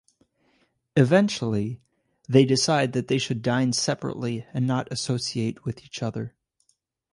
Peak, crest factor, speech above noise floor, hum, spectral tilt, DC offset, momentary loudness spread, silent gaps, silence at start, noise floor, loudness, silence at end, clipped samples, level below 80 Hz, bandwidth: -4 dBFS; 20 dB; 47 dB; none; -5 dB/octave; under 0.1%; 13 LU; none; 0.95 s; -71 dBFS; -24 LUFS; 0.85 s; under 0.1%; -60 dBFS; 11.5 kHz